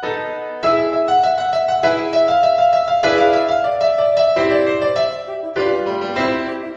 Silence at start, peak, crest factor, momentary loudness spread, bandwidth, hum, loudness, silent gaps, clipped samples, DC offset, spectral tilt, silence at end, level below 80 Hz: 0 s; -2 dBFS; 14 dB; 7 LU; 7.8 kHz; none; -17 LUFS; none; under 0.1%; under 0.1%; -5 dB/octave; 0 s; -52 dBFS